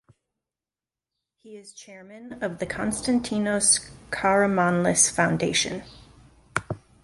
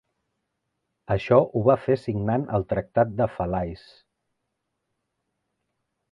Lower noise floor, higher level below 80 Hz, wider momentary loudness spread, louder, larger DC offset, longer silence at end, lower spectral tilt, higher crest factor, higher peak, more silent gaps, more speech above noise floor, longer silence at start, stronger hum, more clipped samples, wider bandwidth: first, under -90 dBFS vs -79 dBFS; about the same, -54 dBFS vs -50 dBFS; first, 24 LU vs 9 LU; about the same, -23 LUFS vs -24 LUFS; neither; second, 0.25 s vs 2.35 s; second, -3 dB/octave vs -9.5 dB/octave; about the same, 22 dB vs 22 dB; about the same, -4 dBFS vs -4 dBFS; neither; first, over 65 dB vs 56 dB; first, 1.45 s vs 1.1 s; neither; neither; first, 11.5 kHz vs 7.2 kHz